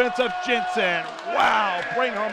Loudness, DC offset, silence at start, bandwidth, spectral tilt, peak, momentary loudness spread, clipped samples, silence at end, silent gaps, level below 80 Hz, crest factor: -22 LUFS; under 0.1%; 0 s; 13 kHz; -3 dB/octave; -10 dBFS; 5 LU; under 0.1%; 0 s; none; -62 dBFS; 14 dB